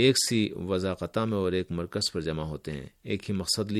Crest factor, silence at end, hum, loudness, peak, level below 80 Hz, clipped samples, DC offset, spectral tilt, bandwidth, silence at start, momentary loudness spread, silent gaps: 20 dB; 0 s; none; -29 LUFS; -8 dBFS; -52 dBFS; under 0.1%; under 0.1%; -4.5 dB/octave; 14.5 kHz; 0 s; 10 LU; none